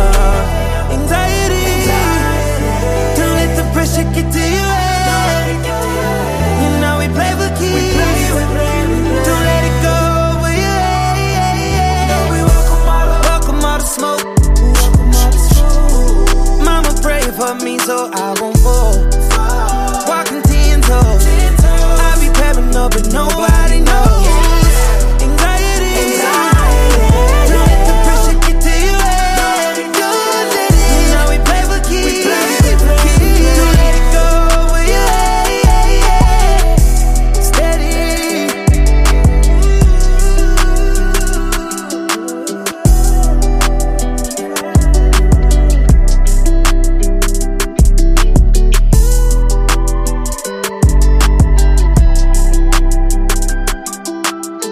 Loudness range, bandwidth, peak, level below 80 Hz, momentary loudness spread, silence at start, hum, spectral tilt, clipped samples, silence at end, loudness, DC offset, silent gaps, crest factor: 3 LU; 15.5 kHz; 0 dBFS; -10 dBFS; 6 LU; 0 s; none; -4.5 dB/octave; under 0.1%; 0 s; -13 LUFS; under 0.1%; none; 10 dB